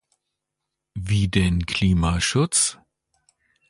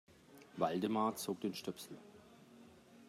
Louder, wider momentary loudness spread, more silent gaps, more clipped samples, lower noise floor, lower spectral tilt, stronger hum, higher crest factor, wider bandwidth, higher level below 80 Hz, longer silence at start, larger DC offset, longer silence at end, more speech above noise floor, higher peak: first, -21 LUFS vs -39 LUFS; second, 6 LU vs 25 LU; neither; neither; first, -82 dBFS vs -61 dBFS; about the same, -4 dB/octave vs -5 dB/octave; neither; about the same, 18 dB vs 20 dB; second, 11.5 kHz vs 16 kHz; first, -36 dBFS vs -82 dBFS; first, 0.95 s vs 0.3 s; neither; first, 0.95 s vs 0 s; first, 62 dB vs 22 dB; first, -6 dBFS vs -22 dBFS